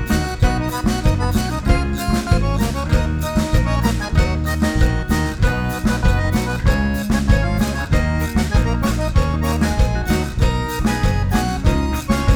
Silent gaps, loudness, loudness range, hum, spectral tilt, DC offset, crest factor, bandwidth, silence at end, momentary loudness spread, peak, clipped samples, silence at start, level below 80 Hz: none; -19 LUFS; 1 LU; none; -6 dB/octave; under 0.1%; 16 dB; over 20 kHz; 0 s; 3 LU; 0 dBFS; under 0.1%; 0 s; -20 dBFS